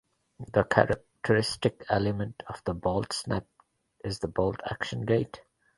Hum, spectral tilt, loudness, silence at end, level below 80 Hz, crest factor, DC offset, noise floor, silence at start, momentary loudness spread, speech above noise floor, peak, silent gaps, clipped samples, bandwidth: none; -5.5 dB/octave; -29 LUFS; 0.35 s; -52 dBFS; 26 dB; under 0.1%; -65 dBFS; 0.4 s; 12 LU; 37 dB; -4 dBFS; none; under 0.1%; 11.5 kHz